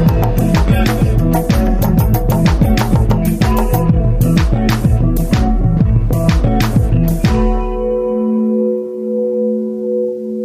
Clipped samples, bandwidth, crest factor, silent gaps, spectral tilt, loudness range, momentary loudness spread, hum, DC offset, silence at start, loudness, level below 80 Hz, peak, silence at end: under 0.1%; 16 kHz; 12 dB; none; -7.5 dB/octave; 2 LU; 5 LU; none; under 0.1%; 0 s; -14 LUFS; -18 dBFS; 0 dBFS; 0 s